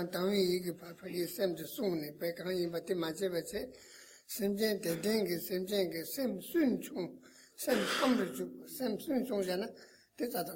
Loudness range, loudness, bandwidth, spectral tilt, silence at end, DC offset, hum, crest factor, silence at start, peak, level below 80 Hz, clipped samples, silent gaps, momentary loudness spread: 3 LU; -35 LUFS; 17 kHz; -4.5 dB/octave; 0 s; under 0.1%; none; 18 dB; 0 s; -18 dBFS; -72 dBFS; under 0.1%; none; 11 LU